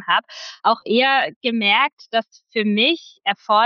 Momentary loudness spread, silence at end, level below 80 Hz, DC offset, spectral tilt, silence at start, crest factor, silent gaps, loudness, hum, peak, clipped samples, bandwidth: 8 LU; 0 s; -76 dBFS; under 0.1%; -4.5 dB/octave; 0 s; 16 dB; 1.36-1.41 s, 1.93-1.97 s; -19 LUFS; none; -4 dBFS; under 0.1%; 7 kHz